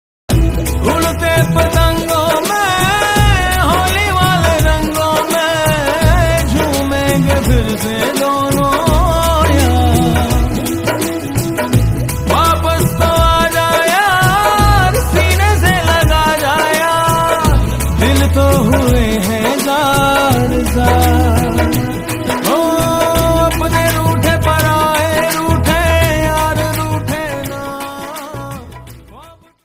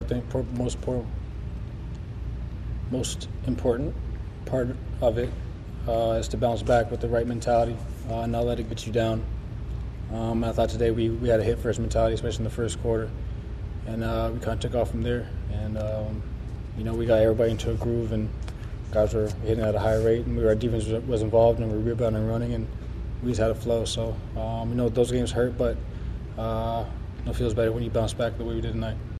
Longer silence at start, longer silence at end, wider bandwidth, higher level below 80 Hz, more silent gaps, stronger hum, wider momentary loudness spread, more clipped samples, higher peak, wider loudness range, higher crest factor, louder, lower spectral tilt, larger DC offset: first, 0.3 s vs 0 s; first, 0.45 s vs 0 s; first, 16.5 kHz vs 13.5 kHz; first, -22 dBFS vs -34 dBFS; neither; neither; second, 6 LU vs 12 LU; neither; first, 0 dBFS vs -8 dBFS; about the same, 3 LU vs 5 LU; second, 12 dB vs 18 dB; first, -12 LUFS vs -27 LUFS; second, -5 dB/octave vs -7 dB/octave; neither